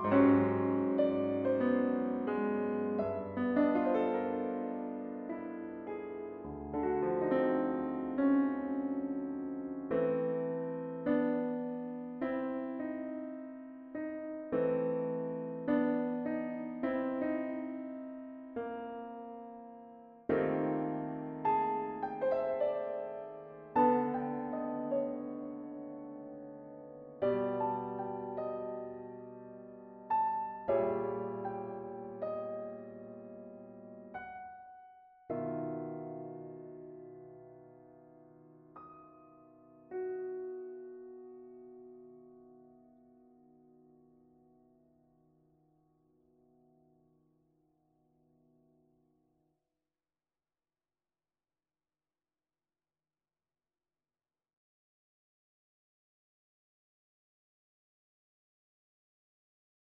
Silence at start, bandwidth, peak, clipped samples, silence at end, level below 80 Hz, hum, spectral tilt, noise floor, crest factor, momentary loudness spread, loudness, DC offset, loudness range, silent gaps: 0 s; 4.3 kHz; -16 dBFS; under 0.1%; 17.2 s; -70 dBFS; none; -7 dB/octave; under -90 dBFS; 22 dB; 19 LU; -35 LUFS; under 0.1%; 12 LU; none